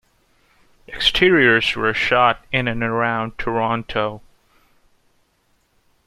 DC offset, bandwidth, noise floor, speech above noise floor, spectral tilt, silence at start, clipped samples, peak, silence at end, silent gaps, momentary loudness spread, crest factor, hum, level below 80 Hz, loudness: under 0.1%; 14 kHz; -63 dBFS; 45 dB; -5 dB/octave; 0.9 s; under 0.1%; -2 dBFS; 1.9 s; none; 10 LU; 20 dB; none; -44 dBFS; -18 LUFS